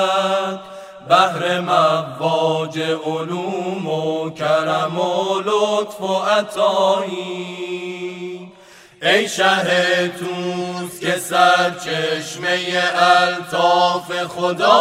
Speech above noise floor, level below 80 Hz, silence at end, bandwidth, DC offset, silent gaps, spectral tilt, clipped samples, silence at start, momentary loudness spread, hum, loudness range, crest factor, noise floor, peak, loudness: 27 dB; -68 dBFS; 0 s; 16 kHz; under 0.1%; none; -4 dB/octave; under 0.1%; 0 s; 12 LU; none; 4 LU; 18 dB; -45 dBFS; 0 dBFS; -18 LUFS